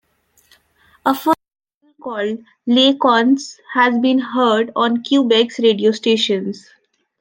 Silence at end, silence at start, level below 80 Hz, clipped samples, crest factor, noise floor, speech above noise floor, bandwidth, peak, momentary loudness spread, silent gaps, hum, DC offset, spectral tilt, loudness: 0.6 s; 1.05 s; -68 dBFS; under 0.1%; 16 dB; -58 dBFS; 42 dB; 16.5 kHz; -2 dBFS; 11 LU; 1.75-1.81 s; none; under 0.1%; -4.5 dB/octave; -16 LUFS